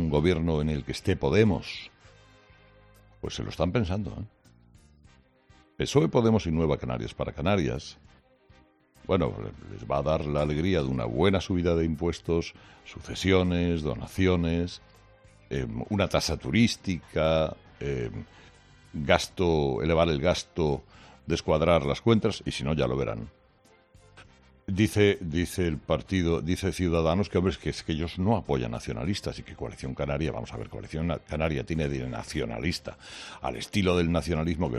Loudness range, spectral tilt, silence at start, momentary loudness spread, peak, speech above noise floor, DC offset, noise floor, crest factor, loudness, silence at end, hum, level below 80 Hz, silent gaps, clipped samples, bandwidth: 5 LU; -6 dB/octave; 0 s; 14 LU; -6 dBFS; 34 dB; under 0.1%; -61 dBFS; 22 dB; -28 LUFS; 0 s; none; -46 dBFS; none; under 0.1%; 13.5 kHz